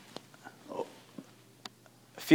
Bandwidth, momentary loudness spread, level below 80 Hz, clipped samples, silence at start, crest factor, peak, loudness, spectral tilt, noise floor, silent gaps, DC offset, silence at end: 19 kHz; 13 LU; -86 dBFS; under 0.1%; 0.45 s; 26 dB; -8 dBFS; -47 LUFS; -5 dB/octave; -59 dBFS; none; under 0.1%; 0 s